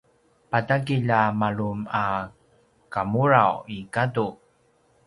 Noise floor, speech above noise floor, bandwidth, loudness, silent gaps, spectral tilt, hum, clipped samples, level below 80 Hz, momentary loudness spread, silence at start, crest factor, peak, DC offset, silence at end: -63 dBFS; 40 dB; 11.5 kHz; -24 LUFS; none; -7.5 dB/octave; none; under 0.1%; -58 dBFS; 12 LU; 0.5 s; 22 dB; -2 dBFS; under 0.1%; 0.75 s